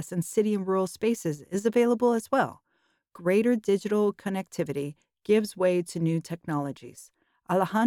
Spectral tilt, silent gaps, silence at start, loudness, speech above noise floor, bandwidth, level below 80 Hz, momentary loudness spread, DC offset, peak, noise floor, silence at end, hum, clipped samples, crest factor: -6.5 dB/octave; none; 0 s; -27 LUFS; 46 dB; 17.5 kHz; -72 dBFS; 9 LU; under 0.1%; -12 dBFS; -73 dBFS; 0 s; none; under 0.1%; 16 dB